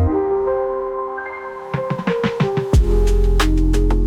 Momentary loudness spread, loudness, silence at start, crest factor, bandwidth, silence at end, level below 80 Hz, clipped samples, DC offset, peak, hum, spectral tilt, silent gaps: 9 LU; -19 LUFS; 0 s; 12 dB; 12.5 kHz; 0 s; -20 dBFS; under 0.1%; under 0.1%; -6 dBFS; none; -7 dB/octave; none